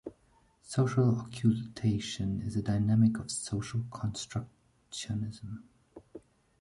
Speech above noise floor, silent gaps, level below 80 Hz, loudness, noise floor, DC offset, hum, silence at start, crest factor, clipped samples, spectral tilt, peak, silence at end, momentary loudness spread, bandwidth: 36 dB; none; -56 dBFS; -32 LUFS; -67 dBFS; under 0.1%; none; 0.05 s; 18 dB; under 0.1%; -6.5 dB/octave; -14 dBFS; 0.4 s; 18 LU; 11.5 kHz